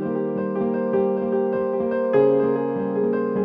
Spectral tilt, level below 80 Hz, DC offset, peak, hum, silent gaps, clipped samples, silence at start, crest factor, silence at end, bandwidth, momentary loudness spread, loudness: -11 dB/octave; -60 dBFS; under 0.1%; -8 dBFS; none; none; under 0.1%; 0 s; 14 dB; 0 s; 4.1 kHz; 6 LU; -22 LUFS